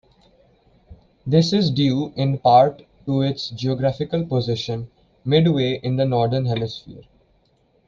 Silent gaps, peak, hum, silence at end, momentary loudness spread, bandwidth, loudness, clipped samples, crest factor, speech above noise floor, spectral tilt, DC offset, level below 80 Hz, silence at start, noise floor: none; -2 dBFS; none; 0.9 s; 14 LU; 7.4 kHz; -20 LUFS; under 0.1%; 18 dB; 42 dB; -7.5 dB/octave; under 0.1%; -52 dBFS; 0.9 s; -61 dBFS